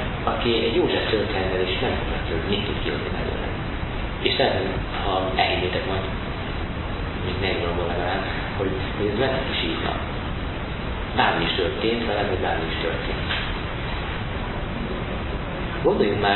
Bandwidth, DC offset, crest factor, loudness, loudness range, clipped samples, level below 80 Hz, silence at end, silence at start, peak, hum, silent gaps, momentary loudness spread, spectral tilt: 4.3 kHz; under 0.1%; 22 dB; -24 LUFS; 2 LU; under 0.1%; -32 dBFS; 0 s; 0 s; -2 dBFS; none; none; 8 LU; -10.5 dB/octave